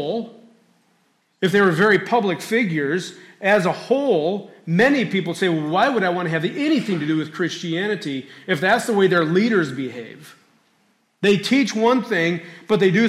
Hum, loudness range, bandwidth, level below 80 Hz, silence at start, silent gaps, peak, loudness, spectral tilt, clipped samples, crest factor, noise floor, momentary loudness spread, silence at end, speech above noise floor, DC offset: none; 2 LU; 15 kHz; -66 dBFS; 0 s; none; -6 dBFS; -20 LUFS; -5.5 dB/octave; under 0.1%; 14 dB; -63 dBFS; 10 LU; 0 s; 44 dB; under 0.1%